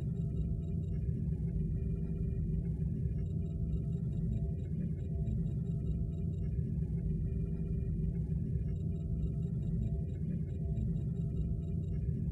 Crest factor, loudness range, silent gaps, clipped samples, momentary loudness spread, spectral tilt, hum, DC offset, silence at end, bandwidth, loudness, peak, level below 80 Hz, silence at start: 12 dB; 0 LU; none; under 0.1%; 2 LU; -11.5 dB/octave; none; under 0.1%; 0 s; 4 kHz; -37 LUFS; -22 dBFS; -40 dBFS; 0 s